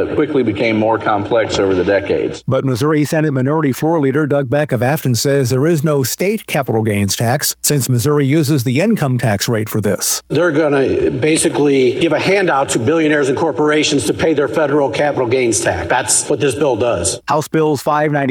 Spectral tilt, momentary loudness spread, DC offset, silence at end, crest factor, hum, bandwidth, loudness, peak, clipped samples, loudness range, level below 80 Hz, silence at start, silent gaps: -5 dB/octave; 3 LU; under 0.1%; 0 s; 14 dB; none; over 20 kHz; -15 LUFS; -2 dBFS; under 0.1%; 2 LU; -48 dBFS; 0 s; none